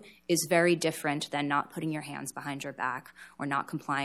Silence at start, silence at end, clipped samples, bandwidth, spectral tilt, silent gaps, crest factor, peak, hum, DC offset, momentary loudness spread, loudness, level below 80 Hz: 0 s; 0 s; under 0.1%; 15.5 kHz; -4 dB/octave; none; 20 dB; -10 dBFS; none; under 0.1%; 13 LU; -31 LUFS; -76 dBFS